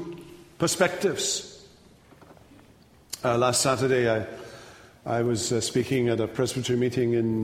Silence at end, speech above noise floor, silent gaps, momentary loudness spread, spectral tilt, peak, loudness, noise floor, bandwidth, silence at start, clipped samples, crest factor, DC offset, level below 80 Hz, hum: 0 s; 30 dB; none; 18 LU; -4 dB/octave; -8 dBFS; -25 LUFS; -55 dBFS; 16 kHz; 0 s; under 0.1%; 20 dB; under 0.1%; -58 dBFS; none